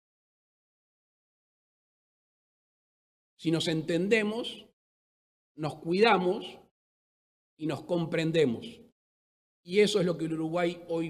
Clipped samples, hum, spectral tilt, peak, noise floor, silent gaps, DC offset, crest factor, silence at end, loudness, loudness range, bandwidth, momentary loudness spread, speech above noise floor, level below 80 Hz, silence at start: under 0.1%; none; -5.5 dB/octave; -10 dBFS; under -90 dBFS; 4.73-5.55 s, 6.71-7.57 s, 8.92-9.63 s; under 0.1%; 22 dB; 0 s; -29 LUFS; 4 LU; 13.5 kHz; 14 LU; over 62 dB; -74 dBFS; 3.4 s